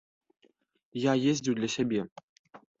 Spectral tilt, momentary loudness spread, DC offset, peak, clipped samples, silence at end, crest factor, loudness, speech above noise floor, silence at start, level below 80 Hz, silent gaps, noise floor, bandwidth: -5 dB/octave; 12 LU; under 0.1%; -14 dBFS; under 0.1%; 0.2 s; 18 dB; -29 LUFS; 40 dB; 0.95 s; -70 dBFS; 2.12-2.16 s, 2.23-2.44 s; -69 dBFS; 8 kHz